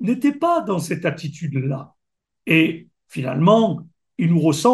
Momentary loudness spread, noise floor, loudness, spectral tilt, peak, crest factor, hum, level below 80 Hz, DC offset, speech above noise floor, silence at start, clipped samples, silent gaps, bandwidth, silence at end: 16 LU; -80 dBFS; -20 LUFS; -6.5 dB/octave; -2 dBFS; 18 dB; none; -66 dBFS; under 0.1%; 61 dB; 0 s; under 0.1%; none; 12.5 kHz; 0 s